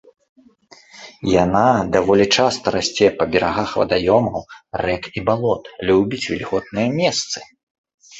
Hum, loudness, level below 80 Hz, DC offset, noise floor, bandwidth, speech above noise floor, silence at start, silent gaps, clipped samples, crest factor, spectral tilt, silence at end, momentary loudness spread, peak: none; -18 LUFS; -46 dBFS; under 0.1%; -49 dBFS; 8.2 kHz; 31 dB; 0.95 s; 7.63-7.84 s, 7.94-7.98 s; under 0.1%; 18 dB; -4.5 dB/octave; 0 s; 9 LU; -2 dBFS